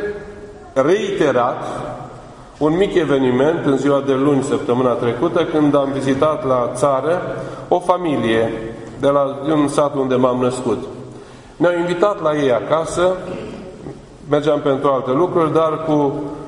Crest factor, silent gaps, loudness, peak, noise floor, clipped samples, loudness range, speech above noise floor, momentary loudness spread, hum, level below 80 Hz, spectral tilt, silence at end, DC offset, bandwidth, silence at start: 18 dB; none; -17 LUFS; 0 dBFS; -37 dBFS; under 0.1%; 2 LU; 21 dB; 15 LU; none; -48 dBFS; -6.5 dB/octave; 0 s; under 0.1%; 11 kHz; 0 s